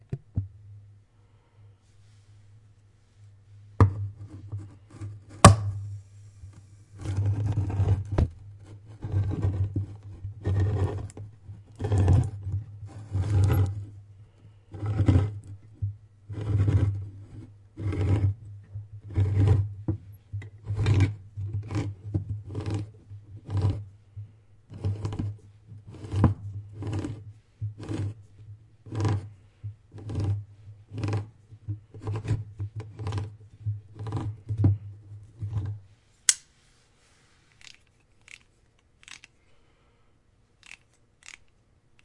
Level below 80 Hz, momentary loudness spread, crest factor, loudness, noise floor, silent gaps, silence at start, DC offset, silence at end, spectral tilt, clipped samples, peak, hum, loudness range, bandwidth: -46 dBFS; 24 LU; 30 dB; -28 LUFS; -63 dBFS; none; 0.1 s; under 0.1%; 0.75 s; -5.5 dB/octave; under 0.1%; 0 dBFS; none; 10 LU; 12 kHz